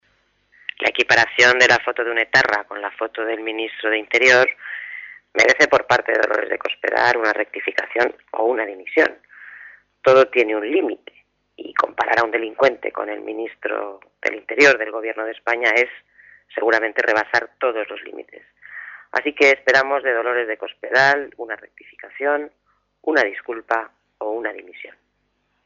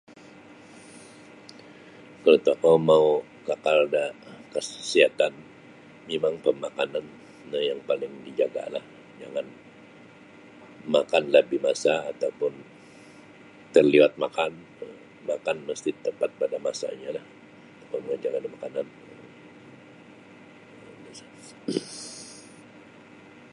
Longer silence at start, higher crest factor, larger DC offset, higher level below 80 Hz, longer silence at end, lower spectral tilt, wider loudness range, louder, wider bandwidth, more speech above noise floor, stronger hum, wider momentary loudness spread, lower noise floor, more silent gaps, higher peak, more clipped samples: second, 0.8 s vs 0.95 s; second, 16 dB vs 24 dB; neither; first, -64 dBFS vs -72 dBFS; second, 0.75 s vs 1.1 s; second, -3 dB/octave vs -4.5 dB/octave; second, 5 LU vs 16 LU; first, -18 LUFS vs -25 LUFS; second, 7.6 kHz vs 11 kHz; first, 50 dB vs 25 dB; first, 50 Hz at -70 dBFS vs none; second, 18 LU vs 26 LU; first, -69 dBFS vs -50 dBFS; neither; about the same, -4 dBFS vs -4 dBFS; neither